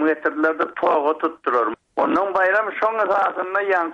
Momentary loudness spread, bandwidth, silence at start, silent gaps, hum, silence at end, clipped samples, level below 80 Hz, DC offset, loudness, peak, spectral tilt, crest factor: 4 LU; 7.8 kHz; 0 s; none; none; 0 s; under 0.1%; -66 dBFS; under 0.1%; -20 LUFS; -6 dBFS; -5.5 dB/octave; 14 dB